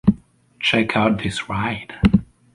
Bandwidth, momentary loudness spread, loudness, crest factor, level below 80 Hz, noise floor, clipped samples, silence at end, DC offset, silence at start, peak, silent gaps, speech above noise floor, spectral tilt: 11.5 kHz; 7 LU; -20 LUFS; 18 dB; -36 dBFS; -44 dBFS; under 0.1%; 0.3 s; under 0.1%; 0.05 s; -2 dBFS; none; 25 dB; -6 dB/octave